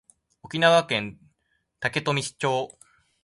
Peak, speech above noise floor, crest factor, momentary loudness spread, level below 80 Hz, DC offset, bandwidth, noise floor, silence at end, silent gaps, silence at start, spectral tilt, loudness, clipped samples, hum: -6 dBFS; 49 dB; 22 dB; 15 LU; -64 dBFS; under 0.1%; 11.5 kHz; -73 dBFS; 0.55 s; none; 0.45 s; -4 dB/octave; -24 LUFS; under 0.1%; none